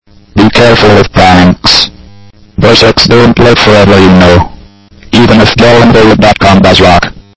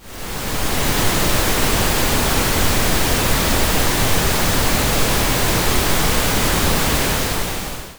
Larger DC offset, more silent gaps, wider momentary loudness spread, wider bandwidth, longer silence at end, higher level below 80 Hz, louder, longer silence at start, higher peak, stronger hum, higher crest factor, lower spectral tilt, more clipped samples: first, 4% vs under 0.1%; neither; about the same, 6 LU vs 4 LU; second, 8 kHz vs over 20 kHz; first, 0.2 s vs 0 s; about the same, -22 dBFS vs -24 dBFS; first, -3 LUFS vs -17 LUFS; about the same, 0.1 s vs 0 s; about the same, 0 dBFS vs -2 dBFS; neither; second, 4 dB vs 14 dB; first, -5.5 dB/octave vs -3 dB/octave; first, 10% vs under 0.1%